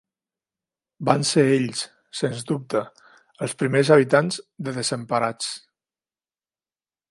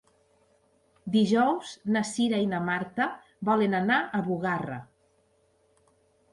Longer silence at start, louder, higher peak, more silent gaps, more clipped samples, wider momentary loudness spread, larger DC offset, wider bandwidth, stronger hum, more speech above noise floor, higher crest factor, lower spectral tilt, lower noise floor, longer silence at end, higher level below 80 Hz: about the same, 1 s vs 1.05 s; first, -22 LUFS vs -27 LUFS; first, 0 dBFS vs -12 dBFS; neither; neither; first, 14 LU vs 9 LU; neither; about the same, 11.5 kHz vs 11.5 kHz; neither; first, over 68 dB vs 41 dB; first, 24 dB vs 16 dB; about the same, -5 dB/octave vs -5.5 dB/octave; first, under -90 dBFS vs -67 dBFS; about the same, 1.55 s vs 1.5 s; about the same, -68 dBFS vs -68 dBFS